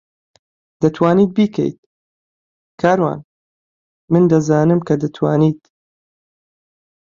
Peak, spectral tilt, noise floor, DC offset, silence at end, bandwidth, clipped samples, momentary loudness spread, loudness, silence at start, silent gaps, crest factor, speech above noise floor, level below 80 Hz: -2 dBFS; -8 dB/octave; under -90 dBFS; under 0.1%; 1.45 s; 7.4 kHz; under 0.1%; 8 LU; -16 LUFS; 0.8 s; 1.78-2.78 s, 3.24-4.08 s; 16 dB; over 76 dB; -56 dBFS